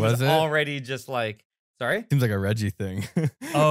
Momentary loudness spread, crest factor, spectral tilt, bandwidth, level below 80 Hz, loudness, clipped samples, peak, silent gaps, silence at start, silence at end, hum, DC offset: 10 LU; 16 dB; -6 dB/octave; 16 kHz; -64 dBFS; -25 LUFS; under 0.1%; -8 dBFS; 1.45-1.50 s, 1.59-1.74 s; 0 s; 0 s; none; under 0.1%